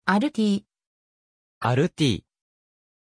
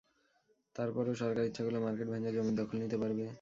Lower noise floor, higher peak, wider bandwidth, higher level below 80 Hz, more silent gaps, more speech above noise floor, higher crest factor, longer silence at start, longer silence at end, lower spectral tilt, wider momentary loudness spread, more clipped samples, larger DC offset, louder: first, under -90 dBFS vs -75 dBFS; first, -8 dBFS vs -22 dBFS; first, 11 kHz vs 7.6 kHz; first, -58 dBFS vs -70 dBFS; first, 0.87-1.61 s vs none; first, over 68 dB vs 39 dB; about the same, 18 dB vs 14 dB; second, 0.05 s vs 0.75 s; first, 0.9 s vs 0 s; second, -6 dB/octave vs -7.5 dB/octave; first, 7 LU vs 3 LU; neither; neither; first, -24 LUFS vs -36 LUFS